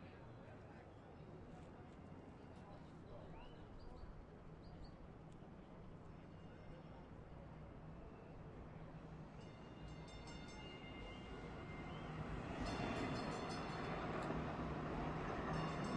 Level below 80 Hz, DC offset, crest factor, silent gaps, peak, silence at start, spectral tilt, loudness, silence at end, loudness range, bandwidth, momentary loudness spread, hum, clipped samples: -60 dBFS; under 0.1%; 18 dB; none; -32 dBFS; 0 s; -6.5 dB/octave; -51 LUFS; 0 s; 13 LU; 11 kHz; 14 LU; none; under 0.1%